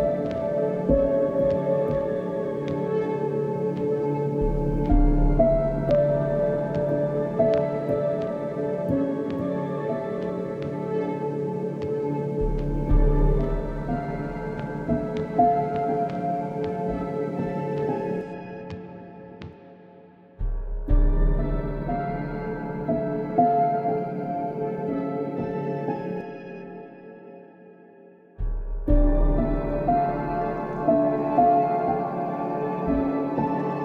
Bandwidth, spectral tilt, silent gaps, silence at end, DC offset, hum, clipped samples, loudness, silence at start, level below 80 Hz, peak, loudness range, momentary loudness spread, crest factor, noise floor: 5.2 kHz; -10 dB/octave; none; 0 s; under 0.1%; none; under 0.1%; -26 LUFS; 0 s; -30 dBFS; -8 dBFS; 8 LU; 12 LU; 16 dB; -51 dBFS